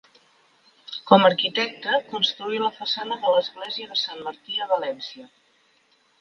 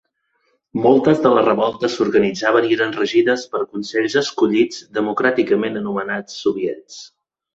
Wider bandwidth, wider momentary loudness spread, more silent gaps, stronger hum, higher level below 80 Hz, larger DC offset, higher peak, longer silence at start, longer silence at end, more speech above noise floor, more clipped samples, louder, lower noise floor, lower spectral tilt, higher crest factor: second, 7 kHz vs 8 kHz; first, 17 LU vs 10 LU; neither; neither; second, -76 dBFS vs -58 dBFS; neither; about the same, 0 dBFS vs -2 dBFS; first, 0.9 s vs 0.75 s; first, 0.95 s vs 0.5 s; second, 40 dB vs 49 dB; neither; second, -23 LUFS vs -18 LUFS; second, -63 dBFS vs -67 dBFS; about the same, -4.5 dB/octave vs -5 dB/octave; first, 24 dB vs 16 dB